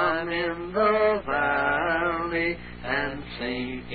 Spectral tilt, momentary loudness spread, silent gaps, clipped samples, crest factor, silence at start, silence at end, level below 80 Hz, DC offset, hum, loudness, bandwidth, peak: -9.5 dB/octave; 9 LU; none; under 0.1%; 16 dB; 0 s; 0 s; -48 dBFS; 0.1%; 60 Hz at -45 dBFS; -26 LUFS; 4.8 kHz; -10 dBFS